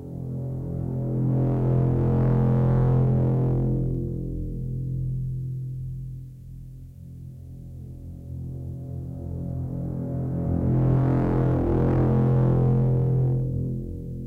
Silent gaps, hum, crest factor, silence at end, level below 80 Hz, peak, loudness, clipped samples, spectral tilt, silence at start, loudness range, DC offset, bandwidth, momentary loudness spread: none; none; 14 dB; 0 s; -36 dBFS; -10 dBFS; -25 LUFS; under 0.1%; -11.5 dB/octave; 0 s; 15 LU; under 0.1%; 2.6 kHz; 19 LU